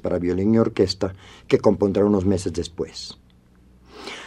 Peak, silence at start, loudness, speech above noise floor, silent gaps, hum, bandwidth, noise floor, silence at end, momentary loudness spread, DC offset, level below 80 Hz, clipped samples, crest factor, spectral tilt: -2 dBFS; 0.05 s; -21 LUFS; 32 dB; none; none; 11.5 kHz; -53 dBFS; 0 s; 16 LU; under 0.1%; -48 dBFS; under 0.1%; 20 dB; -6.5 dB/octave